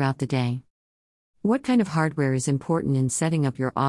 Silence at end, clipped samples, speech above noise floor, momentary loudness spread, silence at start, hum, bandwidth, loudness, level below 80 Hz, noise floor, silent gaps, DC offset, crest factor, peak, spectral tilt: 0 s; under 0.1%; over 67 dB; 5 LU; 0 s; none; 12 kHz; -24 LUFS; -60 dBFS; under -90 dBFS; 0.70-1.34 s; under 0.1%; 16 dB; -8 dBFS; -6 dB/octave